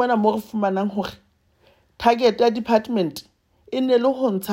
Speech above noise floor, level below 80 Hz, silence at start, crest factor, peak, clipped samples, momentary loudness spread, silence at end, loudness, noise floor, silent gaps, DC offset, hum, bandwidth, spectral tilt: 39 dB; -58 dBFS; 0 s; 18 dB; -4 dBFS; under 0.1%; 11 LU; 0 s; -21 LUFS; -59 dBFS; none; under 0.1%; none; 16 kHz; -6 dB/octave